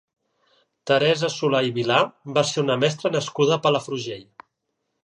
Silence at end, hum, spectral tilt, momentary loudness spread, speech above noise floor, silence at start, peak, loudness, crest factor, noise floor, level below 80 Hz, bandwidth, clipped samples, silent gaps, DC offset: 0.8 s; none; -4.5 dB/octave; 11 LU; 55 dB; 0.85 s; -4 dBFS; -22 LUFS; 20 dB; -77 dBFS; -70 dBFS; 10.5 kHz; under 0.1%; none; under 0.1%